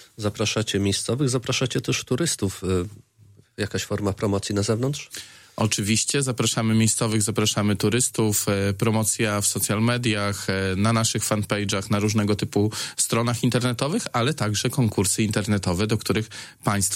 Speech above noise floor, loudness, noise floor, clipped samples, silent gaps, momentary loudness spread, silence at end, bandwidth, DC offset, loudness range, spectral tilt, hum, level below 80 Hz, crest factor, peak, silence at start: 31 dB; -23 LUFS; -54 dBFS; under 0.1%; none; 6 LU; 0 s; 16.5 kHz; under 0.1%; 4 LU; -4 dB/octave; none; -54 dBFS; 18 dB; -6 dBFS; 0 s